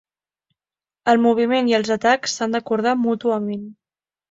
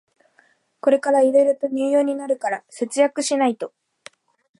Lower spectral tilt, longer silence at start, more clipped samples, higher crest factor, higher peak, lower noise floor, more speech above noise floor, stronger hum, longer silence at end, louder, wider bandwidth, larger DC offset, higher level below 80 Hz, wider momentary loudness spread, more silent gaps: about the same, -4 dB/octave vs -3 dB/octave; first, 1.05 s vs 0.85 s; neither; about the same, 18 dB vs 16 dB; first, -2 dBFS vs -6 dBFS; first, under -90 dBFS vs -60 dBFS; first, over 71 dB vs 41 dB; neither; second, 0.6 s vs 0.9 s; about the same, -19 LUFS vs -20 LUFS; second, 7.8 kHz vs 11.5 kHz; neither; first, -64 dBFS vs -82 dBFS; about the same, 9 LU vs 10 LU; neither